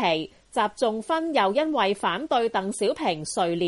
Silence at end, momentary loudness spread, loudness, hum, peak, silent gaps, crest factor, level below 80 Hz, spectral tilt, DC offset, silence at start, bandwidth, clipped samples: 0 s; 4 LU; -25 LUFS; none; -10 dBFS; none; 14 dB; -62 dBFS; -4 dB/octave; under 0.1%; 0 s; 11.5 kHz; under 0.1%